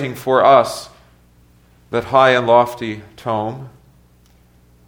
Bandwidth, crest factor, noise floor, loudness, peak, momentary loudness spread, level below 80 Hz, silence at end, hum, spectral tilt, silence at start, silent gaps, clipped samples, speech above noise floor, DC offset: 18.5 kHz; 18 dB; -51 dBFS; -15 LUFS; 0 dBFS; 16 LU; -54 dBFS; 1.2 s; 60 Hz at -50 dBFS; -5 dB/octave; 0 s; none; under 0.1%; 36 dB; under 0.1%